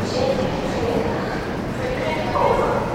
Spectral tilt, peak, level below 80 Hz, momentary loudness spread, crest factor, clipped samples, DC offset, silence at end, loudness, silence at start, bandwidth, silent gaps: -6 dB/octave; -6 dBFS; -38 dBFS; 7 LU; 16 dB; under 0.1%; under 0.1%; 0 s; -22 LUFS; 0 s; 16.5 kHz; none